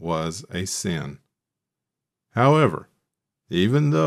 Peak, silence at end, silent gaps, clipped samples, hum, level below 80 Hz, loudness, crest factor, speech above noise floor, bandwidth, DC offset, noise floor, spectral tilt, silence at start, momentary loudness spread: -4 dBFS; 0 s; none; under 0.1%; none; -56 dBFS; -22 LUFS; 18 dB; 64 dB; 14 kHz; under 0.1%; -85 dBFS; -6 dB/octave; 0 s; 13 LU